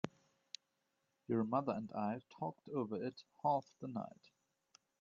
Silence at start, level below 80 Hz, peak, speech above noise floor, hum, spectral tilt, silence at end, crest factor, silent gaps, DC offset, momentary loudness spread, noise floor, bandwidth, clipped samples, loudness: 0.05 s; -84 dBFS; -20 dBFS; 44 dB; none; -6.5 dB/octave; 0.9 s; 24 dB; none; under 0.1%; 17 LU; -85 dBFS; 7.4 kHz; under 0.1%; -41 LUFS